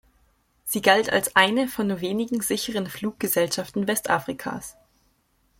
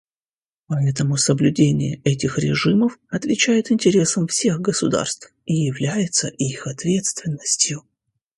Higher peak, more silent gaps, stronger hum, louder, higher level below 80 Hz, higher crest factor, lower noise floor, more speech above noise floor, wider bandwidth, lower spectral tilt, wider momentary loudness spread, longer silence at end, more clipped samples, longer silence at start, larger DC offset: about the same, -2 dBFS vs -2 dBFS; neither; neither; second, -23 LUFS vs -20 LUFS; second, -60 dBFS vs -54 dBFS; first, 24 dB vs 18 dB; second, -66 dBFS vs under -90 dBFS; second, 42 dB vs over 70 dB; first, 16.5 kHz vs 11.5 kHz; second, -3 dB/octave vs -4.5 dB/octave; first, 13 LU vs 8 LU; first, 0.9 s vs 0.55 s; neither; about the same, 0.65 s vs 0.7 s; neither